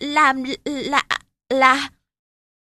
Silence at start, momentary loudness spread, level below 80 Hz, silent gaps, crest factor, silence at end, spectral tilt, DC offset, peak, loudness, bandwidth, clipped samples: 0 s; 11 LU; -58 dBFS; none; 20 dB; 0.8 s; -2 dB/octave; under 0.1%; 0 dBFS; -19 LUFS; 13.5 kHz; under 0.1%